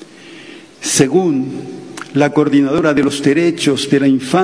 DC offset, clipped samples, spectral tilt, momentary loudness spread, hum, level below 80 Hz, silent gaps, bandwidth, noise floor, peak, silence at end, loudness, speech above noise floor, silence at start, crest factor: 0.1%; under 0.1%; -4.5 dB/octave; 16 LU; none; -52 dBFS; none; 11 kHz; -36 dBFS; 0 dBFS; 0 s; -14 LUFS; 23 dB; 0 s; 14 dB